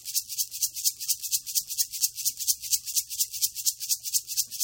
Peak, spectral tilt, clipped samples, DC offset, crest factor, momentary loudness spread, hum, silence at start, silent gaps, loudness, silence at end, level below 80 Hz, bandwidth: -6 dBFS; 5 dB/octave; under 0.1%; under 0.1%; 24 dB; 3 LU; none; 0 s; none; -26 LUFS; 0 s; -70 dBFS; 17 kHz